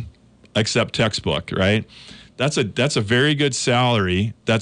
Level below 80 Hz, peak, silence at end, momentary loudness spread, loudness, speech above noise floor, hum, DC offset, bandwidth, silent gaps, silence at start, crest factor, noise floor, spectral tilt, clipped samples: -48 dBFS; -8 dBFS; 0 s; 7 LU; -20 LUFS; 26 dB; none; under 0.1%; 10.5 kHz; none; 0 s; 12 dB; -46 dBFS; -4.5 dB/octave; under 0.1%